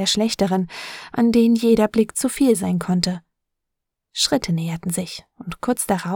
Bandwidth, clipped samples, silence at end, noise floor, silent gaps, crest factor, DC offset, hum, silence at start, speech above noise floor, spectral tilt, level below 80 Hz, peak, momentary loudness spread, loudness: 18.5 kHz; under 0.1%; 0 s; -80 dBFS; none; 16 dB; under 0.1%; none; 0 s; 61 dB; -4.5 dB/octave; -50 dBFS; -4 dBFS; 15 LU; -20 LUFS